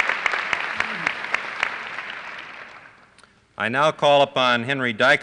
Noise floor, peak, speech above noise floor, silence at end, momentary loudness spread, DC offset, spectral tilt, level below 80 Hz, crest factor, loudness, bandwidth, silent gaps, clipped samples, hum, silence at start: -54 dBFS; -6 dBFS; 35 dB; 0 s; 18 LU; under 0.1%; -4 dB/octave; -64 dBFS; 16 dB; -21 LUFS; 10.5 kHz; none; under 0.1%; none; 0 s